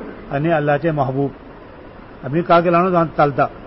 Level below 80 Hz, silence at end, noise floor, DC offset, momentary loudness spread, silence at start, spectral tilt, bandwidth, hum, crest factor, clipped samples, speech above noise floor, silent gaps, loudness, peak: -44 dBFS; 0 s; -38 dBFS; under 0.1%; 10 LU; 0 s; -12 dB/octave; 5.8 kHz; none; 16 dB; under 0.1%; 22 dB; none; -17 LUFS; -2 dBFS